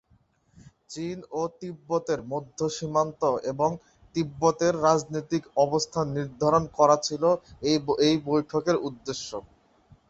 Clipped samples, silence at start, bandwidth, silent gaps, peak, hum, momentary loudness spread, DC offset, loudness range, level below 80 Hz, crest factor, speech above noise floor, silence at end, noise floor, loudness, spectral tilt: under 0.1%; 0.9 s; 8.2 kHz; none; -6 dBFS; none; 12 LU; under 0.1%; 5 LU; -58 dBFS; 20 dB; 39 dB; 0.7 s; -65 dBFS; -26 LUFS; -5 dB/octave